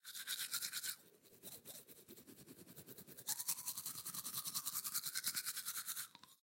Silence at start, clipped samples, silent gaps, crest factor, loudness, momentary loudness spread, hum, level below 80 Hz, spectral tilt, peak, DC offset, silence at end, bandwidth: 0.05 s; under 0.1%; none; 28 dB; -43 LUFS; 17 LU; none; under -90 dBFS; 0.5 dB/octave; -20 dBFS; under 0.1%; 0.05 s; 17 kHz